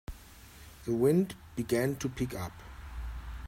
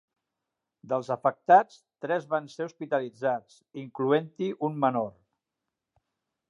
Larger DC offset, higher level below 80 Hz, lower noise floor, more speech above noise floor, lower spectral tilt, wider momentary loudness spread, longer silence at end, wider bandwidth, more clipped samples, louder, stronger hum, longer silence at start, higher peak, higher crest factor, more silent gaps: neither; first, -46 dBFS vs -80 dBFS; second, -52 dBFS vs -86 dBFS; second, 22 dB vs 59 dB; about the same, -6.5 dB/octave vs -7 dB/octave; first, 24 LU vs 18 LU; second, 0 s vs 1.4 s; first, 16 kHz vs 9.8 kHz; neither; second, -32 LUFS vs -28 LUFS; neither; second, 0.1 s vs 0.85 s; second, -14 dBFS vs -6 dBFS; about the same, 18 dB vs 22 dB; neither